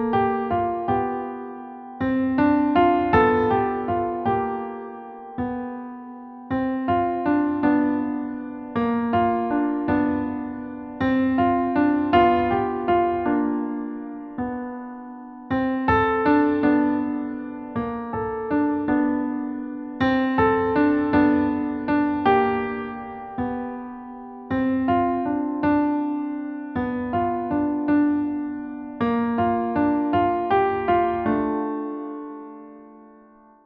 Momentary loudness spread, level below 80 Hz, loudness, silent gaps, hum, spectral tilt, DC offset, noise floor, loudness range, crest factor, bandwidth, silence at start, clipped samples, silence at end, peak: 15 LU; -48 dBFS; -23 LUFS; none; none; -9.5 dB/octave; under 0.1%; -51 dBFS; 4 LU; 18 dB; 4.9 kHz; 0 s; under 0.1%; 0.6 s; -6 dBFS